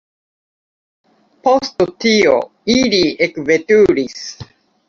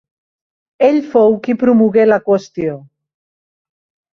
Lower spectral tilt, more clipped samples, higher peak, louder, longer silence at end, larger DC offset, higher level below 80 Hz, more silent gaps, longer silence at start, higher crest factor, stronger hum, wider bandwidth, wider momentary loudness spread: second, -4 dB/octave vs -8 dB/octave; neither; about the same, 0 dBFS vs -2 dBFS; about the same, -14 LUFS vs -13 LUFS; second, 0.45 s vs 1.35 s; neither; first, -50 dBFS vs -58 dBFS; neither; first, 1.45 s vs 0.8 s; about the same, 16 dB vs 14 dB; neither; about the same, 7.4 kHz vs 6.8 kHz; about the same, 9 LU vs 11 LU